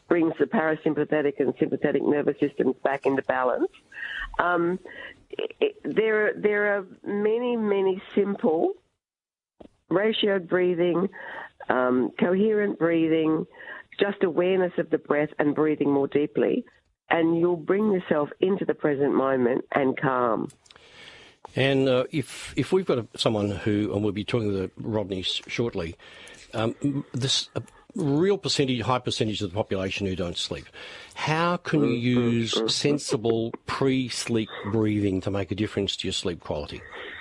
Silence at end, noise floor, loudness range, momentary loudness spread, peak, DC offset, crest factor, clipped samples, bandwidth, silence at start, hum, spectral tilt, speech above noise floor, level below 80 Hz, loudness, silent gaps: 0 s; under -90 dBFS; 3 LU; 10 LU; -4 dBFS; under 0.1%; 22 dB; under 0.1%; 11.5 kHz; 0.1 s; none; -5.5 dB/octave; over 65 dB; -58 dBFS; -25 LUFS; none